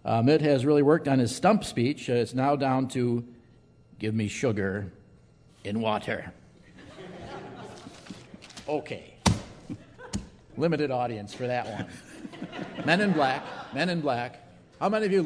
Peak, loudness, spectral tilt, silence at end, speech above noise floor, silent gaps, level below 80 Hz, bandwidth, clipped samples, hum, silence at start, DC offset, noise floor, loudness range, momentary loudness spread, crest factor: -6 dBFS; -27 LUFS; -6 dB/octave; 0 s; 31 dB; none; -54 dBFS; 11 kHz; under 0.1%; none; 0.05 s; under 0.1%; -57 dBFS; 10 LU; 21 LU; 22 dB